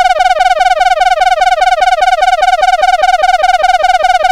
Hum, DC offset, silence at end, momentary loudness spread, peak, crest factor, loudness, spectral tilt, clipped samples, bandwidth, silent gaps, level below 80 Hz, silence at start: none; 0.3%; 0 s; 0 LU; 0 dBFS; 8 dB; -9 LUFS; 0.5 dB/octave; under 0.1%; 13 kHz; none; -32 dBFS; 0 s